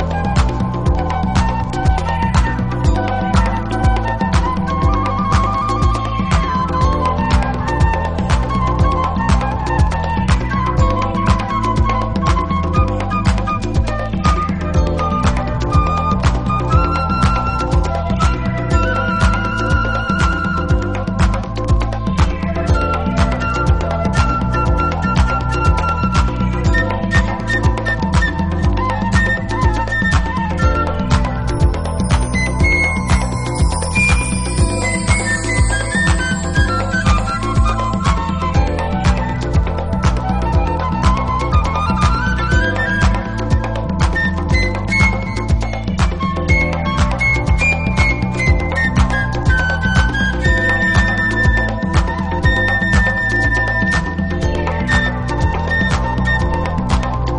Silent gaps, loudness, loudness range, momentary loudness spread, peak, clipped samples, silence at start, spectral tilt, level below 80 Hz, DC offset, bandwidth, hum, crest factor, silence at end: none; -16 LUFS; 2 LU; 4 LU; 0 dBFS; under 0.1%; 0 s; -6 dB/octave; -20 dBFS; under 0.1%; 10.5 kHz; none; 14 dB; 0 s